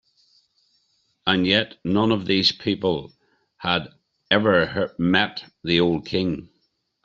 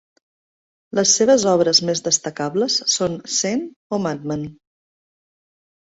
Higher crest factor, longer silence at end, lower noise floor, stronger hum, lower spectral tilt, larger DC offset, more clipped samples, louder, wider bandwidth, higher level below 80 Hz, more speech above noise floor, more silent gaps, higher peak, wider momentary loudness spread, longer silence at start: about the same, 20 dB vs 18 dB; second, 0.6 s vs 1.45 s; second, -70 dBFS vs under -90 dBFS; neither; first, -6 dB/octave vs -3 dB/octave; neither; neither; second, -22 LUFS vs -18 LUFS; about the same, 7.6 kHz vs 8 kHz; about the same, -56 dBFS vs -60 dBFS; second, 49 dB vs over 71 dB; second, none vs 3.76-3.90 s; about the same, -2 dBFS vs -4 dBFS; second, 9 LU vs 12 LU; first, 1.25 s vs 0.95 s